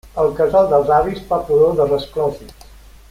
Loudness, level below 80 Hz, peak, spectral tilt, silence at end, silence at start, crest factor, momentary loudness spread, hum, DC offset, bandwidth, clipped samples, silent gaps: -16 LUFS; -40 dBFS; -2 dBFS; -7 dB/octave; 0.6 s; 0.05 s; 16 dB; 8 LU; none; under 0.1%; 15.5 kHz; under 0.1%; none